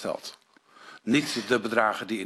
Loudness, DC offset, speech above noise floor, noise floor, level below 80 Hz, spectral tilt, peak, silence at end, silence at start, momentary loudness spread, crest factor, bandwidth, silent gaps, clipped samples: -26 LUFS; under 0.1%; 26 dB; -52 dBFS; -68 dBFS; -4 dB/octave; -6 dBFS; 0 s; 0 s; 14 LU; 22 dB; 13.5 kHz; none; under 0.1%